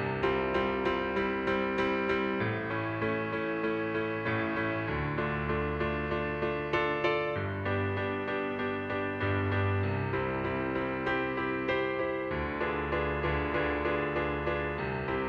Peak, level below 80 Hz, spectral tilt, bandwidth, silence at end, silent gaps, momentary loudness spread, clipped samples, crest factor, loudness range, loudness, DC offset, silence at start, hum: -16 dBFS; -48 dBFS; -8 dB/octave; 6.8 kHz; 0 s; none; 3 LU; under 0.1%; 16 dB; 1 LU; -31 LUFS; under 0.1%; 0 s; none